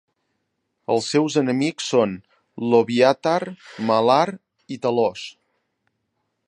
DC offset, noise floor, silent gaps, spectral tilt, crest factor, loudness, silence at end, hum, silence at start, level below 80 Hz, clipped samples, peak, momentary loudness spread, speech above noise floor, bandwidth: under 0.1%; -75 dBFS; none; -5 dB/octave; 20 dB; -20 LUFS; 1.15 s; none; 0.9 s; -68 dBFS; under 0.1%; -2 dBFS; 17 LU; 55 dB; 11 kHz